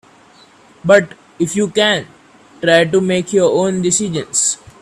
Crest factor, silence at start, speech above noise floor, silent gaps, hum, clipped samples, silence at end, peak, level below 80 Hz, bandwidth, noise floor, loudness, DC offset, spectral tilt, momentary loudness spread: 16 dB; 0.85 s; 32 dB; none; none; under 0.1%; 0.25 s; 0 dBFS; -56 dBFS; 13.5 kHz; -46 dBFS; -15 LUFS; under 0.1%; -3.5 dB/octave; 8 LU